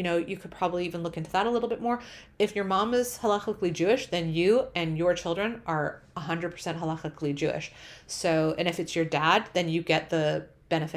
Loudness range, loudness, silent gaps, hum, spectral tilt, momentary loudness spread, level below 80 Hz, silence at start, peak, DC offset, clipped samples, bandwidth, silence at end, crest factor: 4 LU; -28 LUFS; none; none; -5 dB/octave; 9 LU; -58 dBFS; 0 s; -6 dBFS; under 0.1%; under 0.1%; 16 kHz; 0 s; 22 dB